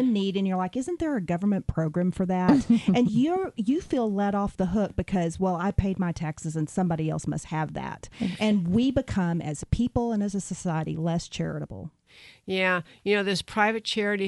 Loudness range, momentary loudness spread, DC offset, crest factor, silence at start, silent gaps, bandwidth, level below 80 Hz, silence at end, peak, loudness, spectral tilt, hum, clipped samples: 4 LU; 9 LU; under 0.1%; 18 dB; 0 s; none; 11.5 kHz; -46 dBFS; 0 s; -8 dBFS; -26 LUFS; -6 dB/octave; none; under 0.1%